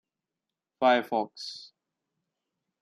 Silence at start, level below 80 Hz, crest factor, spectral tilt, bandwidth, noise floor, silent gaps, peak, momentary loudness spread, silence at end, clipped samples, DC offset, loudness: 0.8 s; -86 dBFS; 20 dB; -4 dB/octave; 13.5 kHz; -88 dBFS; none; -12 dBFS; 16 LU; 1.15 s; under 0.1%; under 0.1%; -27 LUFS